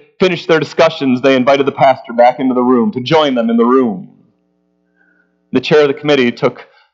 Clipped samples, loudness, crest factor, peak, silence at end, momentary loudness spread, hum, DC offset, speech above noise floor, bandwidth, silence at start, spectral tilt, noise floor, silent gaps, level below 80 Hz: under 0.1%; -12 LUFS; 12 dB; 0 dBFS; 0.3 s; 7 LU; none; under 0.1%; 49 dB; 7.4 kHz; 0.2 s; -6 dB/octave; -61 dBFS; none; -58 dBFS